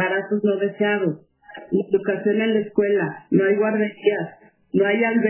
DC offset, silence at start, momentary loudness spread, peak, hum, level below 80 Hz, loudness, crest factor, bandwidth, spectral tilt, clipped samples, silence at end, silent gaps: under 0.1%; 0 s; 7 LU; -6 dBFS; none; -70 dBFS; -21 LUFS; 16 dB; 3.2 kHz; -10.5 dB/octave; under 0.1%; 0 s; none